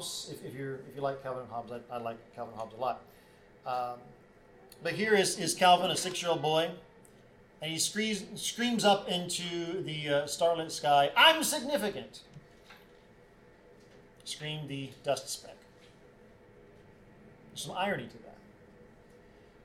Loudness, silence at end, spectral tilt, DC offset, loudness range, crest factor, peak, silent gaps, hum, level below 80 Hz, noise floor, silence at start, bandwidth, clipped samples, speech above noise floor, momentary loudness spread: -31 LUFS; 0.8 s; -3 dB/octave; under 0.1%; 14 LU; 26 dB; -8 dBFS; none; none; -68 dBFS; -58 dBFS; 0 s; 16.5 kHz; under 0.1%; 27 dB; 17 LU